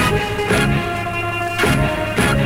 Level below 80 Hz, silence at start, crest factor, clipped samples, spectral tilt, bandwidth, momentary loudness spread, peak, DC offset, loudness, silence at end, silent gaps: -30 dBFS; 0 s; 16 dB; under 0.1%; -5 dB/octave; 16.5 kHz; 5 LU; -2 dBFS; under 0.1%; -18 LUFS; 0 s; none